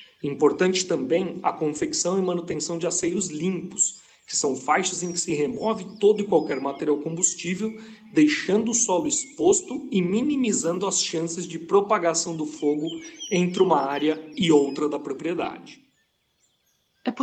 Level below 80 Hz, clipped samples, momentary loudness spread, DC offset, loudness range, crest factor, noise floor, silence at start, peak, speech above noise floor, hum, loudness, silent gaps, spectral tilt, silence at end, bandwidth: -66 dBFS; under 0.1%; 8 LU; under 0.1%; 3 LU; 18 dB; -69 dBFS; 0 s; -6 dBFS; 46 dB; none; -24 LUFS; none; -3.5 dB/octave; 0 s; 9.4 kHz